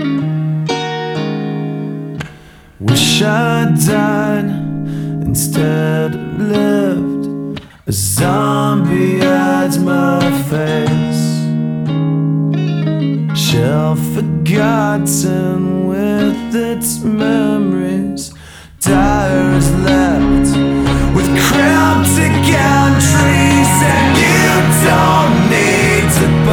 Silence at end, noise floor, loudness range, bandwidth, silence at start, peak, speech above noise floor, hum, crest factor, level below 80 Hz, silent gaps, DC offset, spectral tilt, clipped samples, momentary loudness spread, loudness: 0 s; -38 dBFS; 6 LU; 20 kHz; 0 s; 0 dBFS; 26 dB; none; 12 dB; -30 dBFS; none; under 0.1%; -5 dB/octave; under 0.1%; 9 LU; -13 LUFS